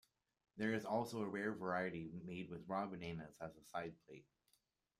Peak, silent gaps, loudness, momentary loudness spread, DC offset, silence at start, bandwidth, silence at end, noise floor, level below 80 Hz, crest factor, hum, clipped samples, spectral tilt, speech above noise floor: -26 dBFS; none; -45 LUFS; 13 LU; under 0.1%; 0.55 s; 15 kHz; 0.75 s; -82 dBFS; -78 dBFS; 20 dB; none; under 0.1%; -6.5 dB/octave; 37 dB